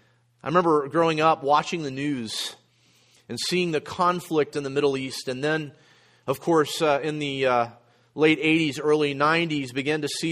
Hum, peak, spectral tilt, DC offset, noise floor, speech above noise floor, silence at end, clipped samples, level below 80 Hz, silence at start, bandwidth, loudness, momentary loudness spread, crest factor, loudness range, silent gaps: none; -6 dBFS; -4.5 dB/octave; under 0.1%; -61 dBFS; 37 dB; 0 s; under 0.1%; -66 dBFS; 0.45 s; 15 kHz; -24 LUFS; 10 LU; 18 dB; 4 LU; none